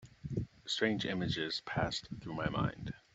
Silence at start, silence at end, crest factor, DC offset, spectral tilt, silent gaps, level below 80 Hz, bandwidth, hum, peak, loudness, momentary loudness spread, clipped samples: 0 s; 0.15 s; 20 dB; under 0.1%; -5 dB/octave; none; -56 dBFS; 8.2 kHz; none; -16 dBFS; -37 LUFS; 8 LU; under 0.1%